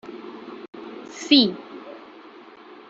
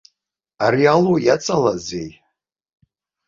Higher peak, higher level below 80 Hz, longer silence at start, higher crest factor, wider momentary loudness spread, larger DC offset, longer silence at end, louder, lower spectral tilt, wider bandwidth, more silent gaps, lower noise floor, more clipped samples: about the same, -2 dBFS vs -2 dBFS; second, -72 dBFS vs -56 dBFS; second, 0.1 s vs 0.6 s; first, 24 dB vs 18 dB; first, 25 LU vs 15 LU; neither; second, 1 s vs 1.15 s; about the same, -18 LUFS vs -17 LUFS; second, -3.5 dB/octave vs -5.5 dB/octave; about the same, 7.8 kHz vs 7.6 kHz; first, 0.68-0.73 s vs none; second, -45 dBFS vs -79 dBFS; neither